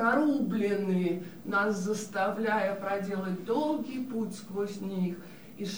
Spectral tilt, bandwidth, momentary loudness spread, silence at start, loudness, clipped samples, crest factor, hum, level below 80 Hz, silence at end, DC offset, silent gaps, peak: -6 dB/octave; over 20 kHz; 7 LU; 0 s; -31 LUFS; under 0.1%; 16 dB; none; -74 dBFS; 0 s; 0.2%; none; -14 dBFS